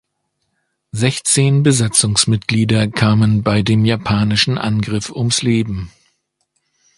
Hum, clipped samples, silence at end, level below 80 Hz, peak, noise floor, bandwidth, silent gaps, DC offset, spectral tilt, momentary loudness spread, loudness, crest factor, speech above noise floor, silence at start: none; under 0.1%; 1.1 s; -42 dBFS; 0 dBFS; -71 dBFS; 12 kHz; none; under 0.1%; -4.5 dB/octave; 7 LU; -15 LUFS; 16 dB; 56 dB; 0.95 s